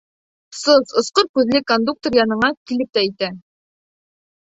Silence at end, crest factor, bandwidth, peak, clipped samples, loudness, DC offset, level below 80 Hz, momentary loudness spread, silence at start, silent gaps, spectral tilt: 1 s; 18 dB; 8.2 kHz; 0 dBFS; under 0.1%; -18 LUFS; under 0.1%; -58 dBFS; 9 LU; 0.5 s; 1.29-1.34 s, 2.57-2.65 s; -3.5 dB/octave